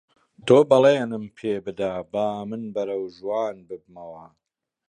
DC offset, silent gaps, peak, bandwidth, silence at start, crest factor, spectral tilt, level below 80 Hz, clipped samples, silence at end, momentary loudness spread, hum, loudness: under 0.1%; none; -4 dBFS; 9.8 kHz; 0.45 s; 20 dB; -6.5 dB/octave; -64 dBFS; under 0.1%; 0.65 s; 23 LU; none; -23 LUFS